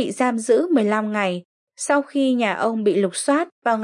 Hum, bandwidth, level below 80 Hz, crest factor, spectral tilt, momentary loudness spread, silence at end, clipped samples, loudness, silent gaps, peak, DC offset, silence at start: none; 11.5 kHz; -80 dBFS; 14 dB; -4.5 dB/octave; 5 LU; 0 s; under 0.1%; -20 LUFS; 1.45-1.67 s, 3.52-3.62 s; -6 dBFS; under 0.1%; 0 s